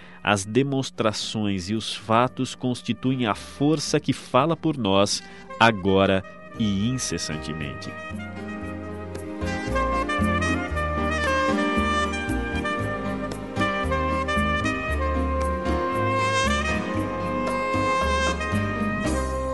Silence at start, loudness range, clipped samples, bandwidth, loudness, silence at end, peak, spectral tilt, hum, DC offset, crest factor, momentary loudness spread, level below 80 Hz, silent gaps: 0 s; 5 LU; under 0.1%; 11.5 kHz; -24 LUFS; 0 s; -2 dBFS; -5 dB/octave; none; 0.4%; 22 dB; 10 LU; -36 dBFS; none